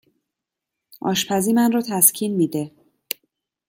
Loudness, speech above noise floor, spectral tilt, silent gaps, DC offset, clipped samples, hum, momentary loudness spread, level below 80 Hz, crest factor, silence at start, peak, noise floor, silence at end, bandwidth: -19 LUFS; 65 dB; -3.5 dB/octave; none; under 0.1%; under 0.1%; none; 16 LU; -66 dBFS; 22 dB; 1.05 s; 0 dBFS; -84 dBFS; 1 s; 17 kHz